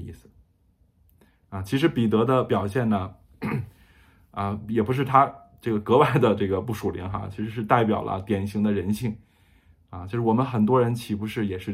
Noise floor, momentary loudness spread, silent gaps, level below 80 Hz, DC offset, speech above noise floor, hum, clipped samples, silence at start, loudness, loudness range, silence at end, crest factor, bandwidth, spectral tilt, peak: -63 dBFS; 15 LU; none; -56 dBFS; under 0.1%; 40 dB; none; under 0.1%; 0 s; -24 LUFS; 3 LU; 0 s; 22 dB; 15.5 kHz; -7.5 dB/octave; -2 dBFS